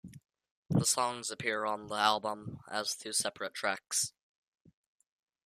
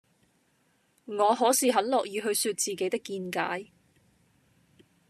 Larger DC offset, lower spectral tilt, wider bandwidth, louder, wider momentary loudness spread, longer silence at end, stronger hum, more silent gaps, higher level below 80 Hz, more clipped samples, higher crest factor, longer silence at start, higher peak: neither; about the same, -2.5 dB/octave vs -2.5 dB/octave; about the same, 15 kHz vs 14.5 kHz; second, -33 LUFS vs -27 LUFS; second, 8 LU vs 11 LU; about the same, 1.35 s vs 1.45 s; neither; first, 0.51-0.63 s vs none; first, -68 dBFS vs -80 dBFS; neither; about the same, 24 dB vs 20 dB; second, 0.05 s vs 1.1 s; about the same, -10 dBFS vs -10 dBFS